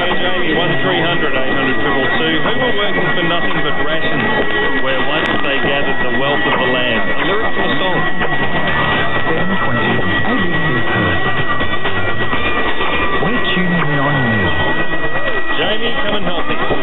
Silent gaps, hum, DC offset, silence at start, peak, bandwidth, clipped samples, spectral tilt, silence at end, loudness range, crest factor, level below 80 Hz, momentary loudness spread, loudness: none; none; under 0.1%; 0 s; 0 dBFS; 4.2 kHz; under 0.1%; -8 dB/octave; 0 s; 1 LU; 12 dB; -32 dBFS; 3 LU; -15 LUFS